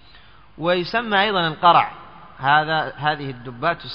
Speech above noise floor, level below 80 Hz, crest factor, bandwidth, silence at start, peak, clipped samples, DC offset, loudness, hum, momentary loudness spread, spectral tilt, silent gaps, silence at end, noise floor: 29 dB; -54 dBFS; 18 dB; 7 kHz; 0.6 s; -2 dBFS; under 0.1%; 0.4%; -20 LUFS; none; 11 LU; -2 dB/octave; none; 0 s; -49 dBFS